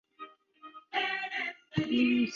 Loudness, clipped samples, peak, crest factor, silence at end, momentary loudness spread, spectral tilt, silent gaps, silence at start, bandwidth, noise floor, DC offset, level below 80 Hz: -31 LUFS; under 0.1%; -16 dBFS; 16 dB; 0 s; 23 LU; -5.5 dB/octave; none; 0.2 s; 7 kHz; -54 dBFS; under 0.1%; -66 dBFS